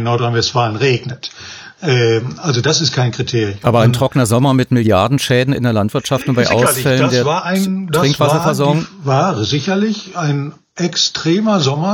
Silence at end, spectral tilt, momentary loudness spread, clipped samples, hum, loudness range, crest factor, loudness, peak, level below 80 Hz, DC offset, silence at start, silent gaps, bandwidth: 0 s; -5 dB/octave; 6 LU; under 0.1%; none; 2 LU; 14 dB; -14 LUFS; 0 dBFS; -50 dBFS; under 0.1%; 0 s; none; 18 kHz